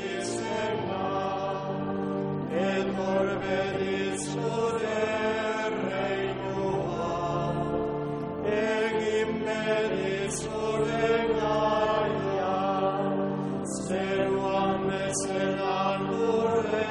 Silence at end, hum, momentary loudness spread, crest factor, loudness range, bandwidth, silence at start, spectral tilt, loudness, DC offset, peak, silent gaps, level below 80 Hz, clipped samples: 0 s; none; 5 LU; 16 dB; 2 LU; 10.5 kHz; 0 s; -5 dB/octave; -28 LUFS; under 0.1%; -12 dBFS; none; -54 dBFS; under 0.1%